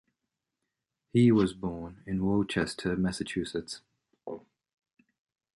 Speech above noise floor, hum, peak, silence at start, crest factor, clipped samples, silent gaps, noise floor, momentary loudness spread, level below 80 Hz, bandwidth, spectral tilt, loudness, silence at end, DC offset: 58 dB; none; -12 dBFS; 1.15 s; 20 dB; under 0.1%; none; -86 dBFS; 20 LU; -56 dBFS; 11.5 kHz; -6.5 dB/octave; -29 LUFS; 1.2 s; under 0.1%